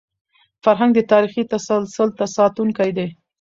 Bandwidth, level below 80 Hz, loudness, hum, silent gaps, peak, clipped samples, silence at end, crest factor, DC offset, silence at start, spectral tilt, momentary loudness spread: 7.6 kHz; -62 dBFS; -18 LUFS; none; none; -2 dBFS; under 0.1%; 0.3 s; 16 dB; under 0.1%; 0.65 s; -6 dB/octave; 7 LU